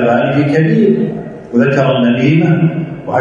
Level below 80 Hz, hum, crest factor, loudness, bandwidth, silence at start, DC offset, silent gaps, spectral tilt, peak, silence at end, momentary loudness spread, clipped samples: -50 dBFS; none; 12 dB; -12 LUFS; 7.4 kHz; 0 s; under 0.1%; none; -8.5 dB/octave; 0 dBFS; 0 s; 7 LU; under 0.1%